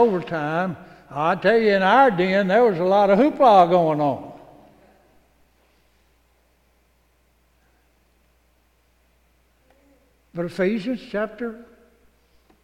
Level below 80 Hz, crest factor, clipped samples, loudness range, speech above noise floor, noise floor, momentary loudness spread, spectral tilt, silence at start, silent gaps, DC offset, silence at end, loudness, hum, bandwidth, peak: -60 dBFS; 20 dB; under 0.1%; 15 LU; 44 dB; -62 dBFS; 18 LU; -7 dB/octave; 0 s; none; under 0.1%; 1 s; -19 LUFS; none; 11 kHz; -4 dBFS